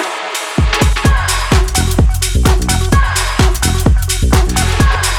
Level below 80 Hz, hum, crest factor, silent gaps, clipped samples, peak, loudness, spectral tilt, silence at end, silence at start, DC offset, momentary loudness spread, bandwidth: -14 dBFS; none; 12 dB; none; under 0.1%; 0 dBFS; -13 LUFS; -4 dB/octave; 0 s; 0 s; under 0.1%; 2 LU; 17.5 kHz